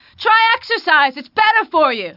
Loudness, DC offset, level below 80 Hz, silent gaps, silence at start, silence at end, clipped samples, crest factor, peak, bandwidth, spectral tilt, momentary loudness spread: -14 LUFS; under 0.1%; -66 dBFS; none; 0.2 s; 0.05 s; under 0.1%; 14 dB; 0 dBFS; 5.8 kHz; -3.5 dB/octave; 4 LU